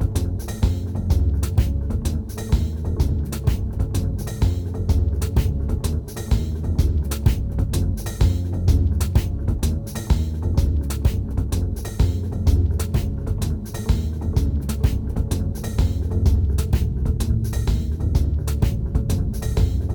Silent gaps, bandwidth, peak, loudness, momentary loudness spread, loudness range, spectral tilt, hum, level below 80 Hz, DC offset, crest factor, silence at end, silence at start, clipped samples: none; over 20 kHz; -6 dBFS; -23 LUFS; 4 LU; 2 LU; -7 dB/octave; none; -24 dBFS; under 0.1%; 16 dB; 0 s; 0 s; under 0.1%